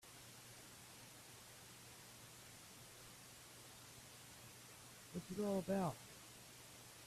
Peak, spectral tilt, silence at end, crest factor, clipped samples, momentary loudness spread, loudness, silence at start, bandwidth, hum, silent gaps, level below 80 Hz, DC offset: -28 dBFS; -5 dB/octave; 0 s; 22 dB; under 0.1%; 15 LU; -51 LUFS; 0.05 s; 15.5 kHz; none; none; -76 dBFS; under 0.1%